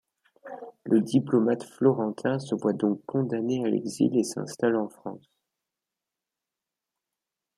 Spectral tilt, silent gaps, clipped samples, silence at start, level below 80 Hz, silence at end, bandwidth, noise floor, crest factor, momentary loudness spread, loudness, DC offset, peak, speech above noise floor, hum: -6.5 dB/octave; none; under 0.1%; 0.45 s; -74 dBFS; 2.4 s; 13.5 kHz; -88 dBFS; 20 dB; 17 LU; -26 LUFS; under 0.1%; -8 dBFS; 63 dB; none